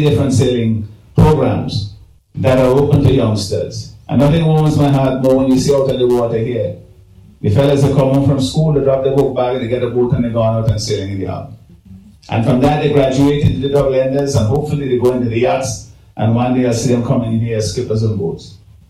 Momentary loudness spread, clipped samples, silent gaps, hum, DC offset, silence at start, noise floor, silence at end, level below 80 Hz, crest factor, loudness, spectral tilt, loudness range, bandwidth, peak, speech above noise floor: 10 LU; under 0.1%; none; none; under 0.1%; 0 s; -42 dBFS; 0.35 s; -34 dBFS; 14 dB; -14 LUFS; -7 dB/octave; 3 LU; 14.5 kHz; 0 dBFS; 29 dB